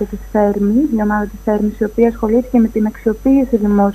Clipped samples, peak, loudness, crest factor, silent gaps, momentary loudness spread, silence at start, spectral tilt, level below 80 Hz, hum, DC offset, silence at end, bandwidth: under 0.1%; 0 dBFS; -15 LUFS; 14 dB; none; 4 LU; 0 s; -9 dB/octave; -34 dBFS; none; under 0.1%; 0 s; 13 kHz